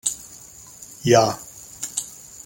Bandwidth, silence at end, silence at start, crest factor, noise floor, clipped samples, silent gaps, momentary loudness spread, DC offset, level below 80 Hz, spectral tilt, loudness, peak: 17 kHz; 0.05 s; 0.05 s; 20 dB; -44 dBFS; under 0.1%; none; 23 LU; under 0.1%; -58 dBFS; -4 dB/octave; -21 LUFS; -4 dBFS